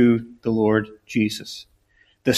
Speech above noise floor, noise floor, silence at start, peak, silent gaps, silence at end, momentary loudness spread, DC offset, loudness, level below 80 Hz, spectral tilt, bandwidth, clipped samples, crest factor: 40 dB; -61 dBFS; 0 s; -6 dBFS; none; 0 s; 14 LU; under 0.1%; -23 LUFS; -56 dBFS; -5.5 dB/octave; 14.5 kHz; under 0.1%; 16 dB